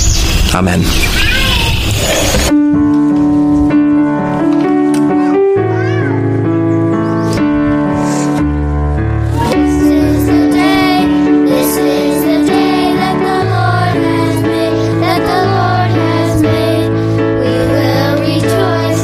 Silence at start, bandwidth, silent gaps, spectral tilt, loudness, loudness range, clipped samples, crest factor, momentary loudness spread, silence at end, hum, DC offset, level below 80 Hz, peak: 0 s; 15.5 kHz; none; -5.5 dB/octave; -11 LUFS; 2 LU; under 0.1%; 10 dB; 3 LU; 0 s; none; under 0.1%; -22 dBFS; 0 dBFS